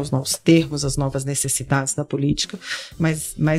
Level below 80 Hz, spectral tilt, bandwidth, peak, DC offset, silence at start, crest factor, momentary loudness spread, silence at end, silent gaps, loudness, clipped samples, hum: -42 dBFS; -4.5 dB/octave; 16 kHz; -2 dBFS; under 0.1%; 0 s; 20 dB; 7 LU; 0 s; none; -21 LUFS; under 0.1%; none